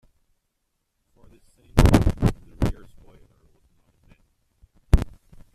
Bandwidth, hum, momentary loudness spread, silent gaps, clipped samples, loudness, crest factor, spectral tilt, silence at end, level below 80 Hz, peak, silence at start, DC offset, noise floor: 14.5 kHz; none; 12 LU; none; under 0.1%; -22 LUFS; 24 dB; -7 dB/octave; 0.45 s; -28 dBFS; -2 dBFS; 1.75 s; under 0.1%; -76 dBFS